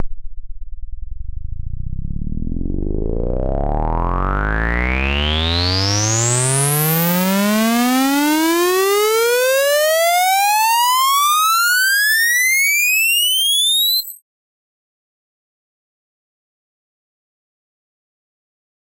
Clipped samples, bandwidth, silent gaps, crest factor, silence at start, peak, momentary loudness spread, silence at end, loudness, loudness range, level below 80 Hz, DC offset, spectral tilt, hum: under 0.1%; 16.5 kHz; none; 16 dB; 0 s; -2 dBFS; 15 LU; 4.85 s; -15 LUFS; 11 LU; -28 dBFS; under 0.1%; -3 dB/octave; none